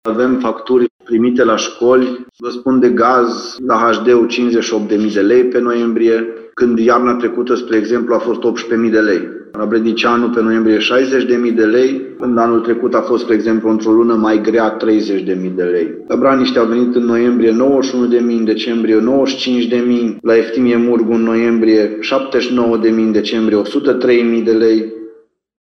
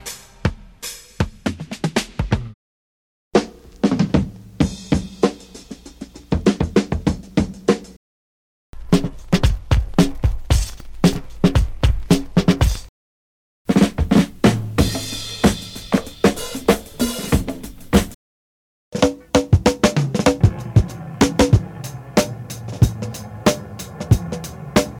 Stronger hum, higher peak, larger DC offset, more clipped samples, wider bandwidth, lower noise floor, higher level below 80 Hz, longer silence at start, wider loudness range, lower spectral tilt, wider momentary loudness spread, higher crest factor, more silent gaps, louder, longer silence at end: neither; about the same, 0 dBFS vs -2 dBFS; neither; neither; second, 6.6 kHz vs 17.5 kHz; first, -43 dBFS vs -38 dBFS; second, -56 dBFS vs -28 dBFS; about the same, 0.05 s vs 0.05 s; second, 1 LU vs 4 LU; about the same, -5.5 dB/octave vs -6 dB/octave; second, 5 LU vs 15 LU; about the same, 12 dB vs 16 dB; second, 0.90-0.99 s vs 2.54-3.31 s, 7.96-8.73 s, 12.89-13.65 s, 18.14-18.92 s; first, -13 LUFS vs -20 LUFS; first, 0.5 s vs 0 s